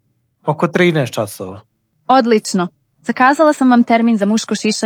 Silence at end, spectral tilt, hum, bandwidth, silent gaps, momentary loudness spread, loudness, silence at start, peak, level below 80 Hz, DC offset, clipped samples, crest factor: 0 s; -5 dB/octave; none; 15.5 kHz; none; 14 LU; -14 LUFS; 0.45 s; 0 dBFS; -66 dBFS; under 0.1%; under 0.1%; 14 dB